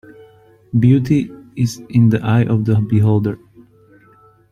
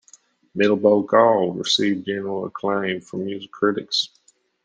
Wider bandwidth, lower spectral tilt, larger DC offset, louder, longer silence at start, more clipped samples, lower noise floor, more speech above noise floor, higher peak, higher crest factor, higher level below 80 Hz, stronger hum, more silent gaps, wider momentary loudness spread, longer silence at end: first, 11.5 kHz vs 10 kHz; first, -8.5 dB/octave vs -4.5 dB/octave; neither; first, -16 LUFS vs -21 LUFS; first, 0.75 s vs 0.55 s; neither; second, -49 dBFS vs -54 dBFS; about the same, 35 dB vs 33 dB; about the same, -2 dBFS vs -2 dBFS; second, 14 dB vs 20 dB; first, -48 dBFS vs -68 dBFS; neither; neither; second, 8 LU vs 13 LU; first, 1.15 s vs 0.6 s